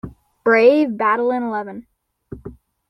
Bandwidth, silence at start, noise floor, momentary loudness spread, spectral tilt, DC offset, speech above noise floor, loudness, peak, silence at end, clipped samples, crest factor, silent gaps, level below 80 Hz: 6 kHz; 0.05 s; -39 dBFS; 24 LU; -7 dB/octave; under 0.1%; 23 dB; -17 LUFS; -2 dBFS; 0.35 s; under 0.1%; 18 dB; none; -52 dBFS